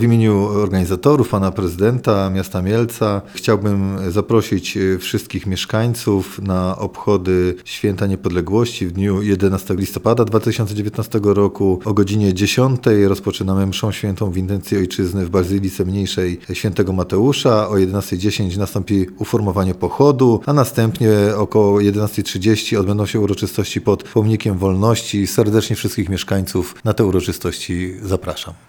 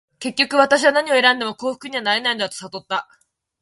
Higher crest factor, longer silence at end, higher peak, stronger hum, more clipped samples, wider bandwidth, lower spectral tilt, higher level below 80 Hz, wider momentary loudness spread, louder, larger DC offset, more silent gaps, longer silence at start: about the same, 16 dB vs 20 dB; second, 0.15 s vs 0.6 s; about the same, 0 dBFS vs 0 dBFS; neither; neither; first, over 20 kHz vs 11.5 kHz; first, -6.5 dB/octave vs -2 dB/octave; first, -44 dBFS vs -68 dBFS; second, 7 LU vs 12 LU; about the same, -17 LUFS vs -18 LUFS; neither; neither; second, 0 s vs 0.2 s